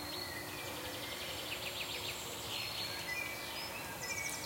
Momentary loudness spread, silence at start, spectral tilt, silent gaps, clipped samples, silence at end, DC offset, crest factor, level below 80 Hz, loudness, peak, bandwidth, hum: 3 LU; 0 s; -1.5 dB/octave; none; under 0.1%; 0 s; under 0.1%; 16 dB; -64 dBFS; -40 LUFS; -26 dBFS; 16.5 kHz; none